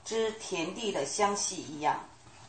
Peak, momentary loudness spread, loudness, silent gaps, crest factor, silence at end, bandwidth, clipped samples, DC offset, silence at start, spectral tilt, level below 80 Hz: -14 dBFS; 6 LU; -32 LUFS; none; 18 dB; 0 s; 8.8 kHz; under 0.1%; under 0.1%; 0.05 s; -2.5 dB/octave; -68 dBFS